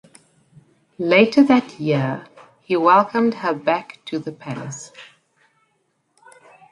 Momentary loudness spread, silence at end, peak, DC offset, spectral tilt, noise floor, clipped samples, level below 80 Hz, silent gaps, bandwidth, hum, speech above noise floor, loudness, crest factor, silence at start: 17 LU; 1.65 s; -2 dBFS; under 0.1%; -6 dB/octave; -68 dBFS; under 0.1%; -66 dBFS; none; 11 kHz; none; 50 dB; -19 LUFS; 20 dB; 1 s